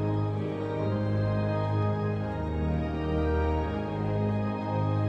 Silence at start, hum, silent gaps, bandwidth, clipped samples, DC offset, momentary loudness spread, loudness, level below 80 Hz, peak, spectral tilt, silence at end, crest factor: 0 s; none; none; 6 kHz; under 0.1%; under 0.1%; 3 LU; -29 LUFS; -40 dBFS; -16 dBFS; -9.5 dB/octave; 0 s; 12 dB